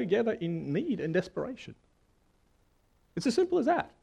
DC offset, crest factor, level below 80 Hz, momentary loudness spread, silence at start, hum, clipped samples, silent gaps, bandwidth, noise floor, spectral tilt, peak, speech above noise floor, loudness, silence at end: under 0.1%; 16 dB; -66 dBFS; 14 LU; 0 s; none; under 0.1%; none; 11 kHz; -68 dBFS; -6.5 dB/octave; -16 dBFS; 38 dB; -31 LUFS; 0.15 s